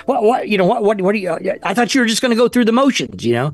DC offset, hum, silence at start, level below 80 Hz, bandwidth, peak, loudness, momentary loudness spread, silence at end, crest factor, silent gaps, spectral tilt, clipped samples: 0.1%; none; 0.1 s; -56 dBFS; 12.5 kHz; -4 dBFS; -15 LUFS; 6 LU; 0 s; 10 dB; none; -4.5 dB/octave; under 0.1%